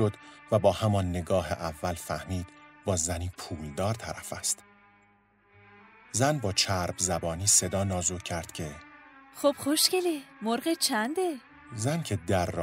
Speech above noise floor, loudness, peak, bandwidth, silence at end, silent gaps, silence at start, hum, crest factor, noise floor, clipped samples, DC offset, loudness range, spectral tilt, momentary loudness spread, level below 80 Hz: 35 dB; -29 LUFS; -8 dBFS; 16 kHz; 0 s; none; 0 s; none; 22 dB; -64 dBFS; under 0.1%; under 0.1%; 6 LU; -3.5 dB/octave; 14 LU; -54 dBFS